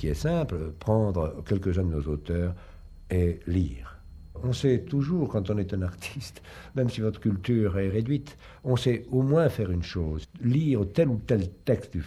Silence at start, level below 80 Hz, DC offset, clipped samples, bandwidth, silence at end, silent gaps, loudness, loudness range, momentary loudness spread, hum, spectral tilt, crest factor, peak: 0 s; -44 dBFS; under 0.1%; under 0.1%; 13.5 kHz; 0 s; none; -28 LUFS; 3 LU; 11 LU; none; -8 dB/octave; 18 dB; -10 dBFS